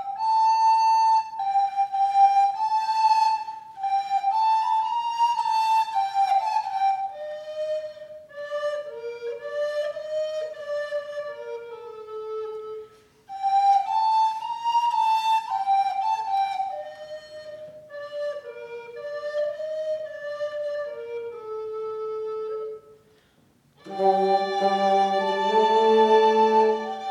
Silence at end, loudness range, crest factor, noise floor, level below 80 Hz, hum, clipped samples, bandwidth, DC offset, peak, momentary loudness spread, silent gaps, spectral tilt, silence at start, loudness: 0 s; 11 LU; 16 dB; -61 dBFS; -76 dBFS; none; under 0.1%; 12.5 kHz; under 0.1%; -8 dBFS; 18 LU; none; -4 dB/octave; 0 s; -24 LUFS